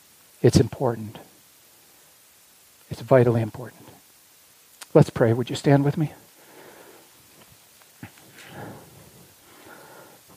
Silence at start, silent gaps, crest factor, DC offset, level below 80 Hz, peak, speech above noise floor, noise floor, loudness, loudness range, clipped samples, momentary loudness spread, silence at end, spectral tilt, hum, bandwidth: 0.45 s; none; 24 dB; under 0.1%; -52 dBFS; -2 dBFS; 34 dB; -55 dBFS; -21 LUFS; 22 LU; under 0.1%; 27 LU; 1.6 s; -7 dB/octave; none; 15.5 kHz